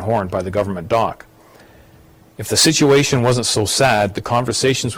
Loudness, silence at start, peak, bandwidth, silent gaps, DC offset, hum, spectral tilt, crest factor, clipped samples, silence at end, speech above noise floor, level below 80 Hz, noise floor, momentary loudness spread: -16 LUFS; 0 s; -4 dBFS; 16.5 kHz; none; under 0.1%; none; -4 dB/octave; 14 dB; under 0.1%; 0 s; 30 dB; -46 dBFS; -47 dBFS; 8 LU